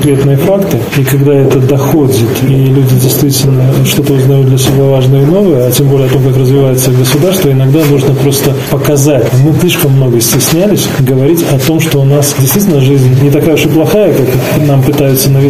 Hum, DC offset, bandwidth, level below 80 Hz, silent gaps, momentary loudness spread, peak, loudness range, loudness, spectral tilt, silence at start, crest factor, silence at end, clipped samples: none; 2%; 16 kHz; -34 dBFS; none; 2 LU; 0 dBFS; 1 LU; -7 LUFS; -6 dB/octave; 0 s; 6 dB; 0 s; under 0.1%